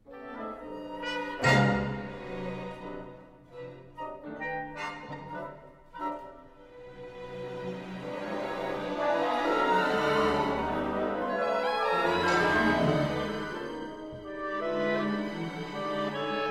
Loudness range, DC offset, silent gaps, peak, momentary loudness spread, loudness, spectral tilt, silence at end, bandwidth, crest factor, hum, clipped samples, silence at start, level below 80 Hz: 12 LU; under 0.1%; none; -12 dBFS; 18 LU; -30 LUFS; -6 dB/octave; 0 s; 15 kHz; 20 dB; none; under 0.1%; 0.05 s; -54 dBFS